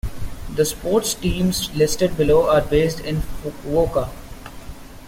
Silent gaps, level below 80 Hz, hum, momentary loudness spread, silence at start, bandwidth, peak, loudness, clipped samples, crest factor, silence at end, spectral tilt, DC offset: none; -32 dBFS; none; 21 LU; 0.05 s; 16.5 kHz; -6 dBFS; -20 LUFS; under 0.1%; 16 dB; 0 s; -5 dB/octave; under 0.1%